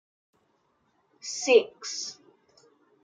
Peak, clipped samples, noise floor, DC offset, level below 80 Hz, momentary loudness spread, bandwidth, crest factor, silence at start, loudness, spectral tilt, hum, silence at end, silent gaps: -8 dBFS; under 0.1%; -71 dBFS; under 0.1%; -88 dBFS; 16 LU; 9.4 kHz; 24 dB; 1.25 s; -26 LUFS; -0.5 dB/octave; none; 0.9 s; none